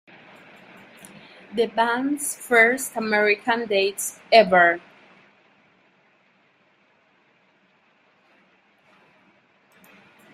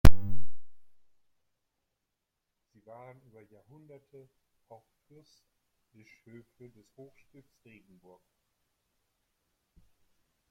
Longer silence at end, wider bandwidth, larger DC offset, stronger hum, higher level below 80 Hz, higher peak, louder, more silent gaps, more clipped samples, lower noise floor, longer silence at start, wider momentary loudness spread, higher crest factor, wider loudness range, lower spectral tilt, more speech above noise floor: second, 5.55 s vs 9.8 s; about the same, 16 kHz vs 16.5 kHz; neither; neither; second, -72 dBFS vs -40 dBFS; about the same, -2 dBFS vs -4 dBFS; first, -20 LUFS vs -35 LUFS; neither; neither; second, -62 dBFS vs -85 dBFS; first, 1.5 s vs 0.05 s; second, 10 LU vs 15 LU; about the same, 22 dB vs 24 dB; about the same, 4 LU vs 5 LU; second, -2.5 dB/octave vs -6.5 dB/octave; first, 42 dB vs 28 dB